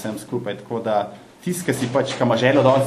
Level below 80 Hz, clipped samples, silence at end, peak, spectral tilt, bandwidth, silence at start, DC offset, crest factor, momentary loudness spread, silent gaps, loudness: -62 dBFS; under 0.1%; 0 s; 0 dBFS; -5.5 dB/octave; 13.5 kHz; 0 s; under 0.1%; 20 dB; 12 LU; none; -21 LUFS